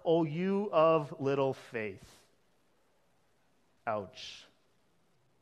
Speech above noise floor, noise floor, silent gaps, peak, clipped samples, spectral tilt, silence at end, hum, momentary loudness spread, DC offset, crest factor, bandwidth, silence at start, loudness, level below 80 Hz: 42 dB; -73 dBFS; none; -14 dBFS; under 0.1%; -7 dB/octave; 1 s; none; 19 LU; under 0.1%; 20 dB; 11 kHz; 0.05 s; -32 LUFS; -76 dBFS